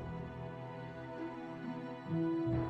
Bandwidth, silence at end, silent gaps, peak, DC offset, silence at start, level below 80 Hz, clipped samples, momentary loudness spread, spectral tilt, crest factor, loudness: 6.2 kHz; 0 s; none; -24 dBFS; under 0.1%; 0 s; -58 dBFS; under 0.1%; 11 LU; -9.5 dB/octave; 16 dB; -41 LUFS